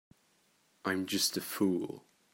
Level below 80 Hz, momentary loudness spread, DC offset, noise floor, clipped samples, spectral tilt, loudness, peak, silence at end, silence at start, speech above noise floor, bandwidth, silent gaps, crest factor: -80 dBFS; 11 LU; under 0.1%; -71 dBFS; under 0.1%; -3 dB/octave; -33 LUFS; -18 dBFS; 0.35 s; 0.85 s; 38 dB; 16.5 kHz; none; 18 dB